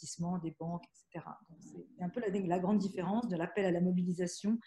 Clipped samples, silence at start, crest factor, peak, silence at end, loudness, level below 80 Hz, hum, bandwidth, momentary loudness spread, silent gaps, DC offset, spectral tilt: under 0.1%; 0 s; 16 dB; -20 dBFS; 0.05 s; -35 LUFS; -72 dBFS; none; 11.5 kHz; 19 LU; none; under 0.1%; -6.5 dB/octave